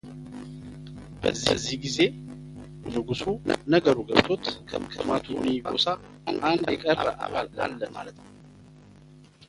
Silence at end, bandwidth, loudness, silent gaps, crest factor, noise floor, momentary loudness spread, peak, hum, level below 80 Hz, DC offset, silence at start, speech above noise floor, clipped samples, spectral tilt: 0.05 s; 11.5 kHz; -26 LUFS; none; 28 dB; -51 dBFS; 19 LU; 0 dBFS; none; -52 dBFS; under 0.1%; 0.05 s; 25 dB; under 0.1%; -4.5 dB/octave